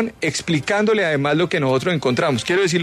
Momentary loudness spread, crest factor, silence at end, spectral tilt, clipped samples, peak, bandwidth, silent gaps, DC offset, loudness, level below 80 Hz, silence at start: 3 LU; 12 dB; 0 s; -5 dB/octave; under 0.1%; -8 dBFS; 13.5 kHz; none; under 0.1%; -19 LUFS; -54 dBFS; 0 s